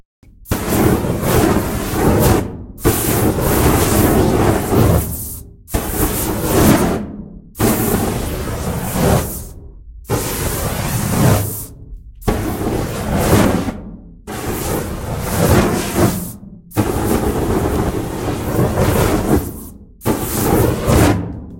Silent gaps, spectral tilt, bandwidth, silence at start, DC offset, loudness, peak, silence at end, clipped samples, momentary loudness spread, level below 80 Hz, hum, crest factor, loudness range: none; -5.5 dB/octave; 16.5 kHz; 0.4 s; under 0.1%; -17 LUFS; 0 dBFS; 0 s; under 0.1%; 12 LU; -28 dBFS; none; 16 dB; 4 LU